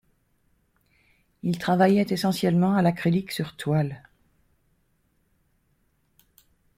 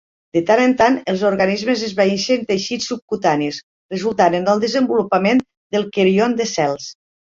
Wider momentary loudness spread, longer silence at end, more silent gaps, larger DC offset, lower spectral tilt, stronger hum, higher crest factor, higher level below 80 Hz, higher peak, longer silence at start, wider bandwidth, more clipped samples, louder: first, 12 LU vs 9 LU; first, 2.8 s vs 0.3 s; second, none vs 3.02-3.08 s, 3.63-3.89 s, 5.57-5.70 s; neither; first, -7 dB/octave vs -5 dB/octave; neither; about the same, 20 dB vs 16 dB; second, -62 dBFS vs -56 dBFS; second, -6 dBFS vs -2 dBFS; first, 1.45 s vs 0.35 s; first, 16 kHz vs 7.6 kHz; neither; second, -24 LUFS vs -17 LUFS